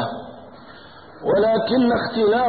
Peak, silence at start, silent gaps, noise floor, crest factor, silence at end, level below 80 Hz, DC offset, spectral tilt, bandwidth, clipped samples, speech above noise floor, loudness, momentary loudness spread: -8 dBFS; 0 s; none; -43 dBFS; 12 dB; 0 s; -52 dBFS; 0.2%; -10.5 dB/octave; 4.8 kHz; under 0.1%; 25 dB; -20 LUFS; 19 LU